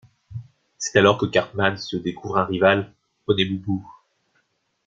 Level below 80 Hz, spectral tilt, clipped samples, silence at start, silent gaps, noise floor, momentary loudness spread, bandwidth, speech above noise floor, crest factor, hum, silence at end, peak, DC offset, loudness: -56 dBFS; -4.5 dB/octave; under 0.1%; 0.3 s; none; -69 dBFS; 21 LU; 7.8 kHz; 48 dB; 22 dB; none; 0.95 s; -2 dBFS; under 0.1%; -21 LUFS